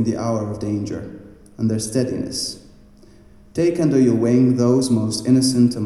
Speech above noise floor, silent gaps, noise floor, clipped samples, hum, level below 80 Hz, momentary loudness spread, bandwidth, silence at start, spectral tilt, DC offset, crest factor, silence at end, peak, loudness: 28 dB; none; -46 dBFS; under 0.1%; none; -50 dBFS; 12 LU; 13 kHz; 0 s; -6 dB/octave; under 0.1%; 16 dB; 0 s; -4 dBFS; -19 LUFS